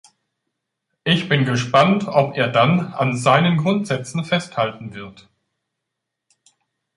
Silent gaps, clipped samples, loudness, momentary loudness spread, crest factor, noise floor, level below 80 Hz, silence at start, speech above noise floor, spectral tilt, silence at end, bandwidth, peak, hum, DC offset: none; under 0.1%; -18 LUFS; 11 LU; 20 dB; -81 dBFS; -60 dBFS; 1.05 s; 62 dB; -6 dB/octave; 1.85 s; 11.5 kHz; 0 dBFS; none; under 0.1%